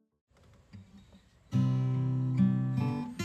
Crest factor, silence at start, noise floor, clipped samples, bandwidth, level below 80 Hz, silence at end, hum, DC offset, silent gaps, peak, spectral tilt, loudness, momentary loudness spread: 16 dB; 0.75 s; -60 dBFS; under 0.1%; 8.2 kHz; -64 dBFS; 0 s; none; under 0.1%; none; -16 dBFS; -8.5 dB/octave; -30 LUFS; 5 LU